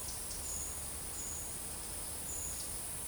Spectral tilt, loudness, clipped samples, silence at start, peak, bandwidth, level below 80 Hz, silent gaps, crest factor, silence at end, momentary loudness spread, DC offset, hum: -1.5 dB/octave; -39 LUFS; under 0.1%; 0 s; -28 dBFS; over 20 kHz; -54 dBFS; none; 14 dB; 0 s; 2 LU; under 0.1%; none